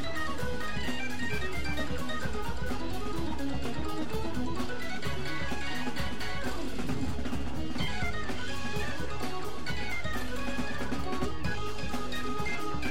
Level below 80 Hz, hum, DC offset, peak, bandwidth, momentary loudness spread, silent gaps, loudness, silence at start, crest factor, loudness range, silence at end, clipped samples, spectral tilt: -44 dBFS; none; 4%; -16 dBFS; 16.5 kHz; 2 LU; none; -35 LUFS; 0 s; 16 dB; 1 LU; 0 s; under 0.1%; -5 dB/octave